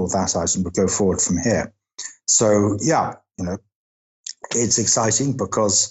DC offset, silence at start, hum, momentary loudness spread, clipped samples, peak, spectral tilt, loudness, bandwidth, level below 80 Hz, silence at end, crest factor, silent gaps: under 0.1%; 0 s; none; 17 LU; under 0.1%; -6 dBFS; -3.5 dB/octave; -19 LUFS; 8.8 kHz; -54 dBFS; 0 s; 14 dB; 3.76-4.24 s